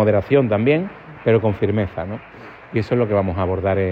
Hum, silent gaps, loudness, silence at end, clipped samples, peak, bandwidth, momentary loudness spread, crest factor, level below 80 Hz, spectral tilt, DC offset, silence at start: none; none; -19 LUFS; 0 s; under 0.1%; -4 dBFS; 5.6 kHz; 14 LU; 16 dB; -50 dBFS; -9.5 dB/octave; under 0.1%; 0 s